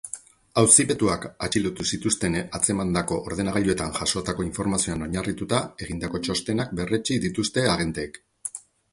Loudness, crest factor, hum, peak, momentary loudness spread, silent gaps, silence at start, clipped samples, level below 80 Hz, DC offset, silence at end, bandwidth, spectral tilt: -24 LUFS; 24 dB; none; 0 dBFS; 11 LU; none; 0.05 s; under 0.1%; -46 dBFS; under 0.1%; 0.35 s; 11.5 kHz; -3.5 dB/octave